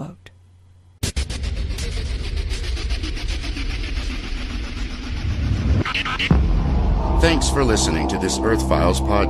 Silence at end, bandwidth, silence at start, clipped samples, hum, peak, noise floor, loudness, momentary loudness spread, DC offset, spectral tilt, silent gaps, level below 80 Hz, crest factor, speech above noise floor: 0 s; 13 kHz; 0 s; under 0.1%; none; -2 dBFS; -49 dBFS; -22 LUFS; 11 LU; under 0.1%; -5 dB/octave; none; -24 dBFS; 18 dB; 32 dB